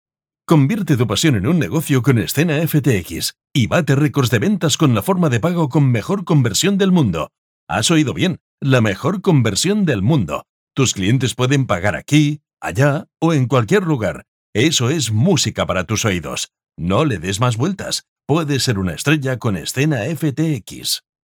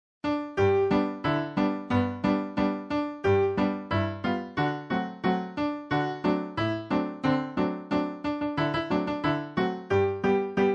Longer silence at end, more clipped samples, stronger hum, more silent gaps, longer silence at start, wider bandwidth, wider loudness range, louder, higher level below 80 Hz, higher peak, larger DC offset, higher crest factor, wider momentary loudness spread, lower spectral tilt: first, 0.3 s vs 0 s; neither; neither; first, 7.38-7.67 s, 8.41-8.58 s, 10.49-10.67 s, 14.28-14.53 s, 18.08-18.16 s vs none; first, 0.5 s vs 0.25 s; first, 20 kHz vs 7.8 kHz; about the same, 3 LU vs 2 LU; first, -17 LUFS vs -28 LUFS; first, -48 dBFS vs -56 dBFS; first, -2 dBFS vs -10 dBFS; neither; about the same, 14 dB vs 16 dB; first, 8 LU vs 5 LU; second, -5 dB/octave vs -7.5 dB/octave